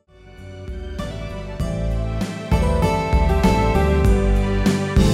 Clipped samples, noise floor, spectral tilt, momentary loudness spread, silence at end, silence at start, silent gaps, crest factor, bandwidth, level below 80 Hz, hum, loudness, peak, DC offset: under 0.1%; -41 dBFS; -7 dB/octave; 14 LU; 0 s; 0.25 s; none; 16 dB; 14 kHz; -22 dBFS; none; -20 LUFS; -4 dBFS; under 0.1%